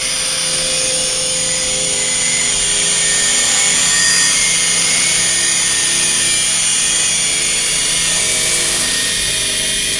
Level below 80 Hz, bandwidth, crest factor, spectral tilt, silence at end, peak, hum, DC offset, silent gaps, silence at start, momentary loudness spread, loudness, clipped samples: -40 dBFS; 12 kHz; 14 dB; 0.5 dB/octave; 0 s; 0 dBFS; none; under 0.1%; none; 0 s; 4 LU; -12 LUFS; under 0.1%